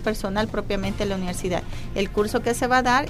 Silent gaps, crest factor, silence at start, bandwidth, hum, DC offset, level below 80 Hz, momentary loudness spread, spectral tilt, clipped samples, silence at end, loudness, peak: none; 16 dB; 0 s; 15.5 kHz; none; under 0.1%; -34 dBFS; 7 LU; -4.5 dB/octave; under 0.1%; 0 s; -25 LUFS; -6 dBFS